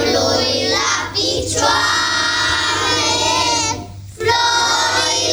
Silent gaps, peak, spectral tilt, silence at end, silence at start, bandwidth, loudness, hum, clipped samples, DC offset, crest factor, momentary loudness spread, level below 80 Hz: none; -2 dBFS; -1.5 dB/octave; 0 s; 0 s; over 20 kHz; -15 LUFS; none; under 0.1%; under 0.1%; 16 dB; 4 LU; -42 dBFS